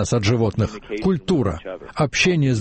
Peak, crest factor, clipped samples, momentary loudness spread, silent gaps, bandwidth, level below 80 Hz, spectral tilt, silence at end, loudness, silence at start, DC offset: -6 dBFS; 14 dB; under 0.1%; 8 LU; none; 8.8 kHz; -40 dBFS; -5.5 dB/octave; 0 s; -20 LUFS; 0 s; under 0.1%